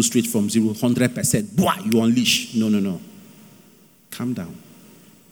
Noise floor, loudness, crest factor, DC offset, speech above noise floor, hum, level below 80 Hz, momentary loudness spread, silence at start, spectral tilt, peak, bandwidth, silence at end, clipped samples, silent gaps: -52 dBFS; -20 LUFS; 18 dB; under 0.1%; 32 dB; none; -58 dBFS; 13 LU; 0 s; -4 dB/octave; -4 dBFS; over 20 kHz; 0.7 s; under 0.1%; none